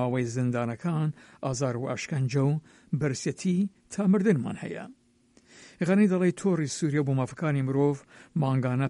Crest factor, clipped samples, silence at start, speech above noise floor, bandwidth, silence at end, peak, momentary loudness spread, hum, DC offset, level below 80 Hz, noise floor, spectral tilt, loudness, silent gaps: 16 dB; under 0.1%; 0 s; 35 dB; 11 kHz; 0 s; -12 dBFS; 11 LU; none; under 0.1%; -64 dBFS; -62 dBFS; -7 dB/octave; -28 LUFS; none